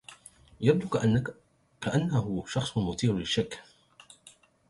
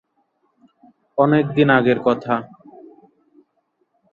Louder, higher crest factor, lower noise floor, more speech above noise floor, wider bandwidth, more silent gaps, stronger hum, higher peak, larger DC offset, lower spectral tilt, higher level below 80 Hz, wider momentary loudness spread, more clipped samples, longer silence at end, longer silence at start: second, -29 LUFS vs -18 LUFS; about the same, 22 dB vs 20 dB; second, -58 dBFS vs -68 dBFS; second, 30 dB vs 52 dB; first, 11.5 kHz vs 6.8 kHz; neither; neither; second, -8 dBFS vs -2 dBFS; neither; second, -6 dB/octave vs -9 dB/octave; first, -54 dBFS vs -62 dBFS; about the same, 11 LU vs 11 LU; neither; second, 0.4 s vs 1.65 s; second, 0.1 s vs 1.15 s